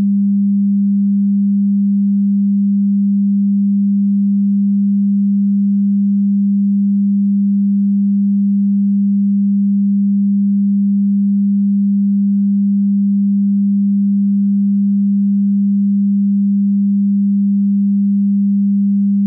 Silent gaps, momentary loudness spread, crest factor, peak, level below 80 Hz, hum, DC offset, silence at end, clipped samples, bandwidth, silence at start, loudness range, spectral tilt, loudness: none; 0 LU; 4 dB; -10 dBFS; -72 dBFS; none; under 0.1%; 0 s; under 0.1%; 0.3 kHz; 0 s; 0 LU; -17 dB/octave; -14 LUFS